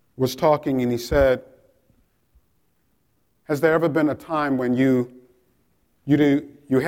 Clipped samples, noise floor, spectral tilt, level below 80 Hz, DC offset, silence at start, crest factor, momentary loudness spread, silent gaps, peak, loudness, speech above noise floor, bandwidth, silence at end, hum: under 0.1%; -68 dBFS; -7 dB/octave; -44 dBFS; under 0.1%; 0.2 s; 16 dB; 7 LU; none; -6 dBFS; -21 LUFS; 48 dB; 16.5 kHz; 0 s; none